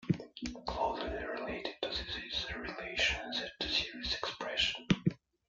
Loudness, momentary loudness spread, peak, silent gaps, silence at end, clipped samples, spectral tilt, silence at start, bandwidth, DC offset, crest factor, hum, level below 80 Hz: -35 LUFS; 8 LU; -12 dBFS; none; 0.3 s; under 0.1%; -4.5 dB/octave; 0 s; 7.8 kHz; under 0.1%; 24 dB; none; -54 dBFS